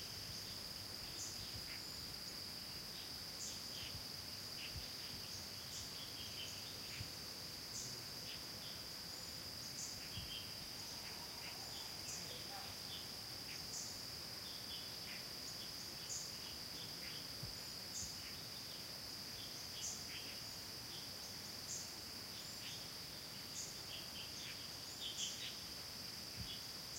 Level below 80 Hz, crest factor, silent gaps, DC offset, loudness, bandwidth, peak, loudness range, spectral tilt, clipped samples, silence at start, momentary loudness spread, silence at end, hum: -68 dBFS; 18 dB; none; under 0.1%; -46 LUFS; 16 kHz; -30 dBFS; 1 LU; -1.5 dB/octave; under 0.1%; 0 s; 2 LU; 0 s; none